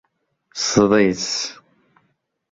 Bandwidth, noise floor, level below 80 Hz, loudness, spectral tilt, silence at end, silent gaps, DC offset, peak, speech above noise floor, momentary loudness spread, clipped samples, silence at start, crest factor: 7.8 kHz; -68 dBFS; -54 dBFS; -18 LUFS; -4 dB/octave; 1 s; none; under 0.1%; -2 dBFS; 50 dB; 13 LU; under 0.1%; 0.55 s; 20 dB